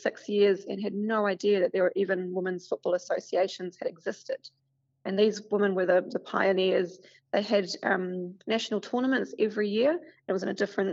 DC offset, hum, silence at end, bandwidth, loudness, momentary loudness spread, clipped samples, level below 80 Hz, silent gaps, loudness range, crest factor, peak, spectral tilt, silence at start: under 0.1%; none; 0 s; 7.8 kHz; -28 LUFS; 10 LU; under 0.1%; -84 dBFS; none; 3 LU; 18 dB; -10 dBFS; -4 dB/octave; 0 s